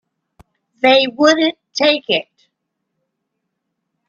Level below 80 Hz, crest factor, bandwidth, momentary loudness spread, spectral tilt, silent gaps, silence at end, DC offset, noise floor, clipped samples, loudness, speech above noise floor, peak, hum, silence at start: -64 dBFS; 18 dB; 7.6 kHz; 7 LU; -2.5 dB/octave; none; 1.85 s; under 0.1%; -75 dBFS; under 0.1%; -14 LUFS; 61 dB; 0 dBFS; none; 0.85 s